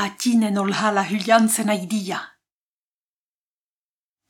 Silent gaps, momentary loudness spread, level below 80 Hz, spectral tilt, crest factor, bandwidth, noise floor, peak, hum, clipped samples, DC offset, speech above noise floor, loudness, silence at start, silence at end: none; 9 LU; -76 dBFS; -4 dB/octave; 20 dB; 17.5 kHz; under -90 dBFS; -4 dBFS; none; under 0.1%; under 0.1%; over 70 dB; -20 LUFS; 0 s; 2 s